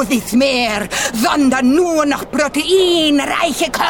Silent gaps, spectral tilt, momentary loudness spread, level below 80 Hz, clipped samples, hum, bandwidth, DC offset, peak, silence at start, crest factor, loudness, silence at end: none; -3 dB/octave; 5 LU; -42 dBFS; under 0.1%; none; 18 kHz; 0.3%; -4 dBFS; 0 s; 12 dB; -14 LUFS; 0 s